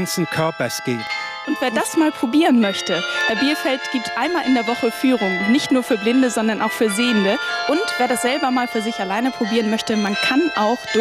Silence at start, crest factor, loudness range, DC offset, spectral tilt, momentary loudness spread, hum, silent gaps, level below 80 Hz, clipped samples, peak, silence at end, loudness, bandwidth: 0 s; 12 dB; 1 LU; under 0.1%; -4 dB/octave; 5 LU; none; none; -60 dBFS; under 0.1%; -8 dBFS; 0 s; -19 LUFS; 15.5 kHz